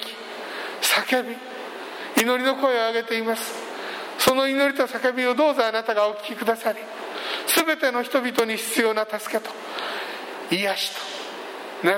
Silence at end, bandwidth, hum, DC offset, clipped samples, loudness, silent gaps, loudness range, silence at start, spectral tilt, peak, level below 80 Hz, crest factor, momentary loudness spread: 0 s; 16.5 kHz; none; under 0.1%; under 0.1%; -23 LUFS; none; 3 LU; 0 s; -2 dB/octave; -2 dBFS; -68 dBFS; 22 dB; 13 LU